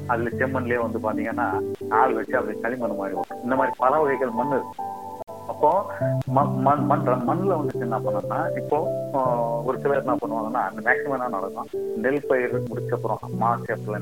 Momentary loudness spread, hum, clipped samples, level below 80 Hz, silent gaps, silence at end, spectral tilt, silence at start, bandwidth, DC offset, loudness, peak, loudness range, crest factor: 8 LU; none; under 0.1%; -60 dBFS; none; 0 s; -8 dB/octave; 0 s; 17 kHz; 0.3%; -24 LUFS; -4 dBFS; 2 LU; 20 dB